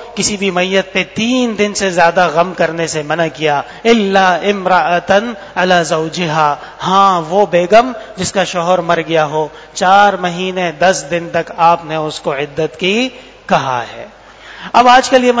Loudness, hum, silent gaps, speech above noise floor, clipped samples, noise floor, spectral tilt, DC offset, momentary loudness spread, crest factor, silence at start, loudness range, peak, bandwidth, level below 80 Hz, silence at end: -13 LUFS; none; none; 21 dB; 0.3%; -34 dBFS; -4 dB/octave; under 0.1%; 10 LU; 12 dB; 0 s; 3 LU; 0 dBFS; 8 kHz; -48 dBFS; 0 s